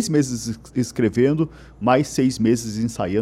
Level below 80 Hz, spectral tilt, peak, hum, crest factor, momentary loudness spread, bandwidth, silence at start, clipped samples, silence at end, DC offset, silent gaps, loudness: -48 dBFS; -6 dB/octave; -4 dBFS; none; 16 dB; 7 LU; 14 kHz; 0 s; under 0.1%; 0 s; under 0.1%; none; -21 LUFS